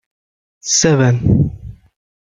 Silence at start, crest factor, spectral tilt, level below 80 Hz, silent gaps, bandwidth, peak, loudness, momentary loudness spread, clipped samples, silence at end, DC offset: 0.65 s; 16 dB; -4.5 dB/octave; -36 dBFS; none; 9.4 kHz; -2 dBFS; -14 LUFS; 15 LU; under 0.1%; 0.65 s; under 0.1%